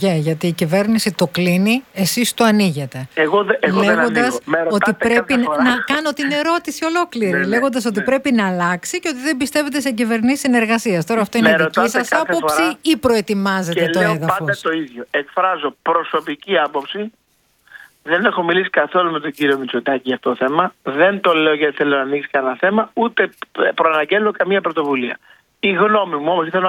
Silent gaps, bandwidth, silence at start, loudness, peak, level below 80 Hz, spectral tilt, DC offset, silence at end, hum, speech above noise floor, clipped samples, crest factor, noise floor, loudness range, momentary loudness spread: none; 18.5 kHz; 0 s; -17 LUFS; 0 dBFS; -56 dBFS; -4.5 dB/octave; under 0.1%; 0 s; none; 38 dB; under 0.1%; 16 dB; -55 dBFS; 3 LU; 6 LU